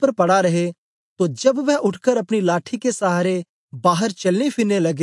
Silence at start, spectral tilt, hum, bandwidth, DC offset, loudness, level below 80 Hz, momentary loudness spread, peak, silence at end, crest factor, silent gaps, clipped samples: 0 s; -5.5 dB/octave; none; 11.5 kHz; under 0.1%; -19 LUFS; -72 dBFS; 7 LU; -4 dBFS; 0 s; 16 dB; 0.78-1.16 s, 3.49-3.68 s; under 0.1%